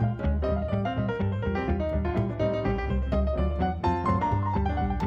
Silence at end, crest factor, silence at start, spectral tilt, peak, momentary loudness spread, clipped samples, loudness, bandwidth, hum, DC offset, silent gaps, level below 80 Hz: 0 s; 14 dB; 0 s; -9 dB/octave; -14 dBFS; 3 LU; under 0.1%; -28 LUFS; 6.6 kHz; none; under 0.1%; none; -32 dBFS